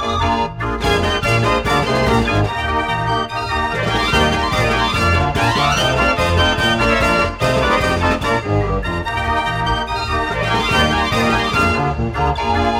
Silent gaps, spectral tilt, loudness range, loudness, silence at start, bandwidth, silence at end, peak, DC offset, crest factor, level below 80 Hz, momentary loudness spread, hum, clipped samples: none; -5 dB/octave; 3 LU; -16 LUFS; 0 s; 16.5 kHz; 0 s; -2 dBFS; under 0.1%; 14 dB; -28 dBFS; 5 LU; none; under 0.1%